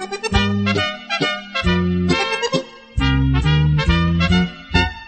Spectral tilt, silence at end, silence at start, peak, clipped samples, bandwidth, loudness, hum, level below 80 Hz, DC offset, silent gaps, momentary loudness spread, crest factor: -5.5 dB/octave; 0 s; 0 s; -2 dBFS; under 0.1%; 8.8 kHz; -18 LUFS; none; -26 dBFS; under 0.1%; none; 5 LU; 16 dB